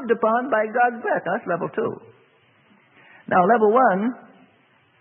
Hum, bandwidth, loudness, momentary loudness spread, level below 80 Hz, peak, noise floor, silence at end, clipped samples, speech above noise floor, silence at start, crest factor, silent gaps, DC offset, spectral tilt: none; 3.5 kHz; -21 LUFS; 12 LU; -76 dBFS; -4 dBFS; -59 dBFS; 0.8 s; under 0.1%; 39 dB; 0 s; 18 dB; none; under 0.1%; -11 dB/octave